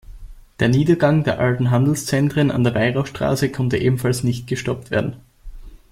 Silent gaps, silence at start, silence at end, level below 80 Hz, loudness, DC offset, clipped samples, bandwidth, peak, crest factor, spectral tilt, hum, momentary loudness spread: none; 0.1 s; 0.15 s; -42 dBFS; -19 LUFS; under 0.1%; under 0.1%; 16 kHz; -2 dBFS; 16 dB; -6.5 dB/octave; none; 7 LU